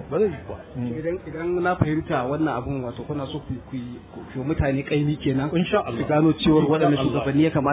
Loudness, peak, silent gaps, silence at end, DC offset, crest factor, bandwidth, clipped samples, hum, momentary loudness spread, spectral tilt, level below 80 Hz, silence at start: -23 LUFS; -4 dBFS; none; 0 s; under 0.1%; 18 dB; 4 kHz; under 0.1%; none; 14 LU; -11.5 dB/octave; -42 dBFS; 0 s